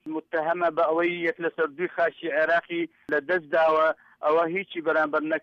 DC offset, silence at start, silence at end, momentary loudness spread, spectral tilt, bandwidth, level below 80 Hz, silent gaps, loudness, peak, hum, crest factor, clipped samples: under 0.1%; 0.05 s; 0.05 s; 6 LU; -6.5 dB/octave; 6.4 kHz; -70 dBFS; none; -25 LUFS; -14 dBFS; none; 12 dB; under 0.1%